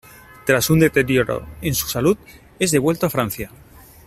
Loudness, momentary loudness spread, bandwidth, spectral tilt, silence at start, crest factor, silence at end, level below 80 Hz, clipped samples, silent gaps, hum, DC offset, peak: -19 LUFS; 10 LU; 16 kHz; -5 dB/octave; 0.45 s; 18 dB; 0.6 s; -44 dBFS; under 0.1%; none; none; under 0.1%; -2 dBFS